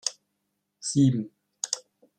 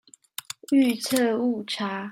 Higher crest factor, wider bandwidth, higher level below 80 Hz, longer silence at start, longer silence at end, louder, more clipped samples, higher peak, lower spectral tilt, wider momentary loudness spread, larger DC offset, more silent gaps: about the same, 20 dB vs 16 dB; second, 11.5 kHz vs 16.5 kHz; about the same, -70 dBFS vs -74 dBFS; second, 0.05 s vs 0.7 s; first, 0.4 s vs 0 s; second, -27 LUFS vs -24 LUFS; neither; about the same, -8 dBFS vs -10 dBFS; about the same, -5 dB/octave vs -4 dB/octave; second, 13 LU vs 16 LU; neither; neither